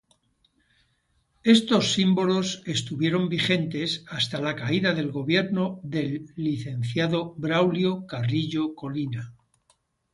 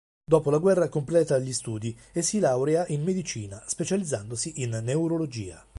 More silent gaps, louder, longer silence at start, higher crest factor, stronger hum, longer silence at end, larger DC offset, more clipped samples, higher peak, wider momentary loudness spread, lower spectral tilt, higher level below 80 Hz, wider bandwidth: neither; about the same, -25 LUFS vs -26 LUFS; first, 1.45 s vs 0.3 s; about the same, 20 dB vs 20 dB; neither; first, 0.8 s vs 0.2 s; neither; neither; about the same, -6 dBFS vs -6 dBFS; about the same, 9 LU vs 11 LU; about the same, -5.5 dB/octave vs -5.5 dB/octave; about the same, -62 dBFS vs -58 dBFS; about the same, 11.5 kHz vs 11.5 kHz